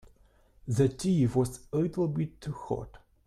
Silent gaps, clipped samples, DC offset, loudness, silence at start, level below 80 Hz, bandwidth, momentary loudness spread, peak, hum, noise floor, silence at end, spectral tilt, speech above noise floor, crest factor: none; under 0.1%; under 0.1%; -30 LUFS; 0.65 s; -54 dBFS; 13.5 kHz; 12 LU; -12 dBFS; none; -62 dBFS; 0.3 s; -7.5 dB/octave; 33 dB; 18 dB